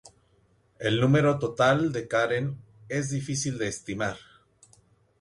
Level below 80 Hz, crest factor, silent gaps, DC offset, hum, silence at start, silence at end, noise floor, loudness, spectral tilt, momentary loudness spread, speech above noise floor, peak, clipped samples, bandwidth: -60 dBFS; 18 dB; none; under 0.1%; none; 0.05 s; 1 s; -65 dBFS; -26 LUFS; -5.5 dB/octave; 11 LU; 39 dB; -10 dBFS; under 0.1%; 11.5 kHz